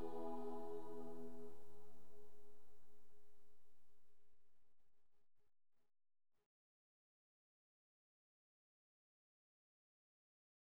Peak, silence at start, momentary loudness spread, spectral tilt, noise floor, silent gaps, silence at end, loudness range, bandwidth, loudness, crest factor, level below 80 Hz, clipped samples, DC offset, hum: -34 dBFS; 0 s; 19 LU; -7.5 dB/octave; -71 dBFS; none; 4.25 s; 11 LU; over 20 kHz; -53 LUFS; 14 dB; -80 dBFS; under 0.1%; 0.5%; none